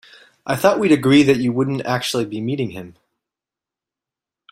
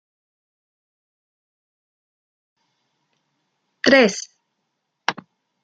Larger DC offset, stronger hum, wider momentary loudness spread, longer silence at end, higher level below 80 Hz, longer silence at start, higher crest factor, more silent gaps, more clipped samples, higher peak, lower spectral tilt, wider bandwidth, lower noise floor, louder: neither; neither; second, 13 LU vs 23 LU; first, 1.6 s vs 0.5 s; first, -58 dBFS vs -70 dBFS; second, 0.45 s vs 3.85 s; about the same, 20 dB vs 24 dB; neither; neither; about the same, 0 dBFS vs -2 dBFS; first, -5.5 dB/octave vs -3 dB/octave; first, 16 kHz vs 9.4 kHz; first, -88 dBFS vs -76 dBFS; about the same, -18 LUFS vs -18 LUFS